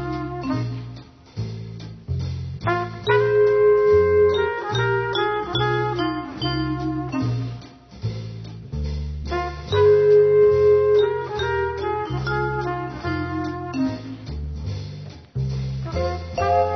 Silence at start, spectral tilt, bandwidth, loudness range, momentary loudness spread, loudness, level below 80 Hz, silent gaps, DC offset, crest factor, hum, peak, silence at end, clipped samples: 0 s; -7 dB/octave; 6.4 kHz; 9 LU; 17 LU; -21 LUFS; -38 dBFS; none; under 0.1%; 14 dB; none; -6 dBFS; 0 s; under 0.1%